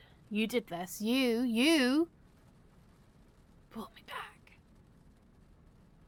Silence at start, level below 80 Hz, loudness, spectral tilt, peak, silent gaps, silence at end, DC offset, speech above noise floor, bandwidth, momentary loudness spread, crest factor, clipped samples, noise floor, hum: 0.3 s; -66 dBFS; -32 LUFS; -4 dB/octave; -18 dBFS; none; 1.8 s; under 0.1%; 30 dB; 17.5 kHz; 20 LU; 18 dB; under 0.1%; -61 dBFS; none